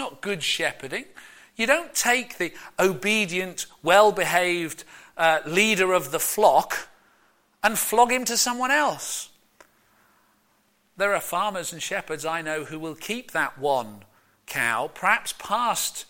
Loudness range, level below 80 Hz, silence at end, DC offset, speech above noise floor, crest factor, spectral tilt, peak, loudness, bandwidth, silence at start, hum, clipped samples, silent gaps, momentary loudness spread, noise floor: 7 LU; -62 dBFS; 0.05 s; under 0.1%; 41 dB; 20 dB; -2 dB/octave; -4 dBFS; -23 LUFS; 17 kHz; 0 s; none; under 0.1%; none; 13 LU; -65 dBFS